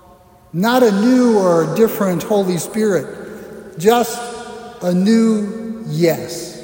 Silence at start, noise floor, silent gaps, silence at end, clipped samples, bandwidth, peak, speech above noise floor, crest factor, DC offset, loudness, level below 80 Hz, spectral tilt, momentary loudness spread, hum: 0.55 s; -46 dBFS; none; 0 s; under 0.1%; 16.5 kHz; -2 dBFS; 31 dB; 16 dB; under 0.1%; -16 LUFS; -56 dBFS; -6 dB/octave; 17 LU; none